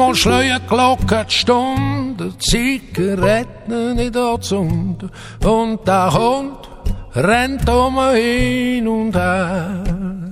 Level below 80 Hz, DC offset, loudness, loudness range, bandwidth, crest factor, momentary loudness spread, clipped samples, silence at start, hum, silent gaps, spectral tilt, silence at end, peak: -28 dBFS; under 0.1%; -16 LUFS; 2 LU; 15.5 kHz; 14 dB; 10 LU; under 0.1%; 0 s; none; none; -5 dB/octave; 0 s; -2 dBFS